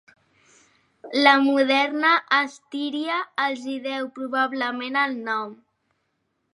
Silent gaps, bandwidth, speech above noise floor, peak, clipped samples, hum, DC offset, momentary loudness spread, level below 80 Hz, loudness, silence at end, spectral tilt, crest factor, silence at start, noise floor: none; 11 kHz; 51 dB; -2 dBFS; under 0.1%; none; under 0.1%; 12 LU; -82 dBFS; -22 LUFS; 1 s; -3 dB/octave; 22 dB; 1.05 s; -74 dBFS